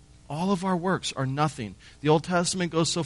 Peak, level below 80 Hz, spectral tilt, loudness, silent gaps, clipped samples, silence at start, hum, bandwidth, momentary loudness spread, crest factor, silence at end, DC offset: -10 dBFS; -56 dBFS; -5 dB/octave; -26 LUFS; none; under 0.1%; 0.3 s; none; 11.5 kHz; 10 LU; 18 dB; 0 s; under 0.1%